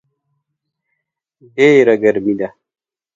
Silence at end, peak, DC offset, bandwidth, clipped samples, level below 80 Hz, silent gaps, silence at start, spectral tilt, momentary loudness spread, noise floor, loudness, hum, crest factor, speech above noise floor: 0.65 s; 0 dBFS; under 0.1%; 7.6 kHz; under 0.1%; -60 dBFS; none; 1.55 s; -6.5 dB/octave; 15 LU; -75 dBFS; -13 LUFS; none; 16 dB; 63 dB